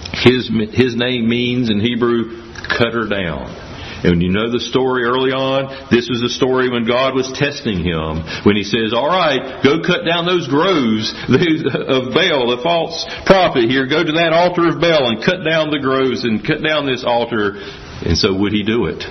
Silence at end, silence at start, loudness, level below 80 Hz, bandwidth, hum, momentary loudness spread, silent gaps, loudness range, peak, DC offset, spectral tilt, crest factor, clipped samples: 0 s; 0 s; -16 LUFS; -42 dBFS; 6.4 kHz; none; 7 LU; none; 3 LU; 0 dBFS; under 0.1%; -5.5 dB/octave; 16 dB; under 0.1%